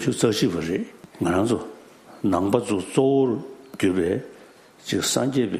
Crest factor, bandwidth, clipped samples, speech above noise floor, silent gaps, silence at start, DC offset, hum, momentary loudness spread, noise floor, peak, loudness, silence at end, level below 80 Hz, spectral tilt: 18 dB; 15 kHz; under 0.1%; 27 dB; none; 0 s; under 0.1%; none; 12 LU; -49 dBFS; -4 dBFS; -23 LUFS; 0 s; -60 dBFS; -5 dB/octave